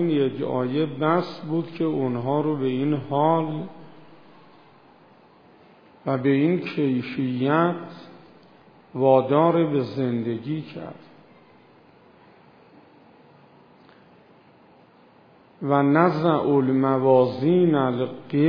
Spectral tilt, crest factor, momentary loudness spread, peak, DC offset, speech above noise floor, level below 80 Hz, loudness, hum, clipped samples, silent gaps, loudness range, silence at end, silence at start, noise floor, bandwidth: -10 dB/octave; 20 dB; 13 LU; -4 dBFS; under 0.1%; 32 dB; -72 dBFS; -22 LUFS; none; under 0.1%; none; 9 LU; 0 s; 0 s; -54 dBFS; 5.2 kHz